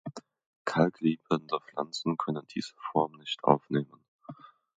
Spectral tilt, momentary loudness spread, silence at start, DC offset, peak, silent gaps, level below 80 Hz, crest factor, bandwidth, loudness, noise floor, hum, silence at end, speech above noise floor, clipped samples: -6.5 dB/octave; 18 LU; 0.05 s; under 0.1%; -4 dBFS; 0.46-0.65 s, 4.08-4.19 s; -74 dBFS; 28 dB; 9.2 kHz; -31 LUFS; -50 dBFS; none; 0.45 s; 20 dB; under 0.1%